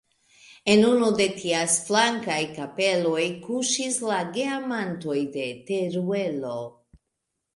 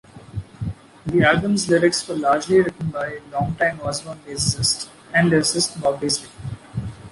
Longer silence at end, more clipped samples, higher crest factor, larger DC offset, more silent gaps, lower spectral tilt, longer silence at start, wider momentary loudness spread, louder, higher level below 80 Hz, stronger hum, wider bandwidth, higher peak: first, 0.85 s vs 0 s; neither; about the same, 20 dB vs 18 dB; neither; neither; about the same, -3.5 dB/octave vs -4 dB/octave; first, 0.65 s vs 0.15 s; second, 10 LU vs 15 LU; second, -24 LUFS vs -20 LUFS; second, -66 dBFS vs -46 dBFS; neither; about the same, 11.5 kHz vs 11.5 kHz; about the same, -6 dBFS vs -4 dBFS